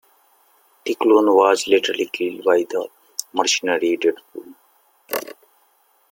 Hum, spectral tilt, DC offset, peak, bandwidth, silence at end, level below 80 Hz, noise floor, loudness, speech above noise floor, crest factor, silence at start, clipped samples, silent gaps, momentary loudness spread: none; -2 dB/octave; under 0.1%; -2 dBFS; 17 kHz; 0.8 s; -72 dBFS; -60 dBFS; -19 LUFS; 42 dB; 20 dB; 0.85 s; under 0.1%; none; 17 LU